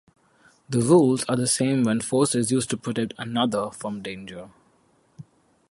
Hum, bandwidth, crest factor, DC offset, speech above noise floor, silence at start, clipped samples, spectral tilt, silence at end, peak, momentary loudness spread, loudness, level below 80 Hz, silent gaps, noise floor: none; 11.5 kHz; 20 dB; under 0.1%; 40 dB; 0.7 s; under 0.1%; -5 dB/octave; 0.5 s; -6 dBFS; 16 LU; -23 LUFS; -62 dBFS; none; -63 dBFS